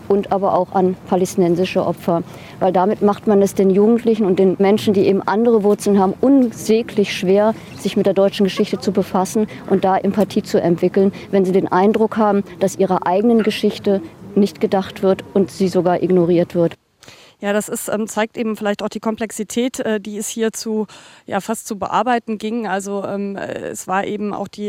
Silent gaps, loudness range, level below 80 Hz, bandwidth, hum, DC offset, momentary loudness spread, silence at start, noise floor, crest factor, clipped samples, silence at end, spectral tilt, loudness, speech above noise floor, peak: none; 7 LU; -56 dBFS; 16.5 kHz; none; under 0.1%; 8 LU; 0 s; -45 dBFS; 16 dB; under 0.1%; 0 s; -6 dB/octave; -17 LUFS; 28 dB; -2 dBFS